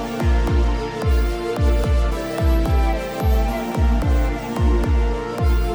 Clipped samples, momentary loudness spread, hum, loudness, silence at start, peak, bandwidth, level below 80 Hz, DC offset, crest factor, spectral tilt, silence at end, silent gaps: under 0.1%; 4 LU; none; -21 LUFS; 0 s; -8 dBFS; over 20 kHz; -20 dBFS; under 0.1%; 10 dB; -7 dB/octave; 0 s; none